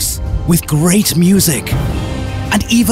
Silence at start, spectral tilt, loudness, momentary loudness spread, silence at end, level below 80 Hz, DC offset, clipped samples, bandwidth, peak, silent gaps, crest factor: 0 s; -4.5 dB/octave; -13 LUFS; 9 LU; 0 s; -24 dBFS; under 0.1%; under 0.1%; 16.5 kHz; -2 dBFS; none; 10 dB